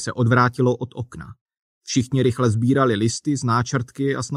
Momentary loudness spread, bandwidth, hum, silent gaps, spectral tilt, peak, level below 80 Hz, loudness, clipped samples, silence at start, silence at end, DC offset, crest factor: 15 LU; 11 kHz; none; 1.41-1.46 s, 1.59-1.81 s; -6 dB/octave; -4 dBFS; -54 dBFS; -20 LUFS; under 0.1%; 0 s; 0 s; under 0.1%; 16 dB